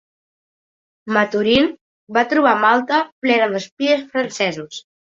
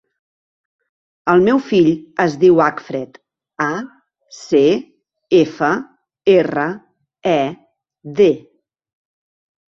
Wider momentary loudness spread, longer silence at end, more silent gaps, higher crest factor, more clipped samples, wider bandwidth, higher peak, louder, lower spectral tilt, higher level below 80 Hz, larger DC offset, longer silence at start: second, 7 LU vs 14 LU; second, 0.3 s vs 1.35 s; first, 1.81-2.07 s, 3.12-3.22 s, 3.72-3.77 s vs none; about the same, 18 dB vs 16 dB; neither; about the same, 7.8 kHz vs 7.4 kHz; about the same, -2 dBFS vs -2 dBFS; about the same, -17 LUFS vs -16 LUFS; second, -4 dB/octave vs -6.5 dB/octave; about the same, -58 dBFS vs -58 dBFS; neither; second, 1.05 s vs 1.25 s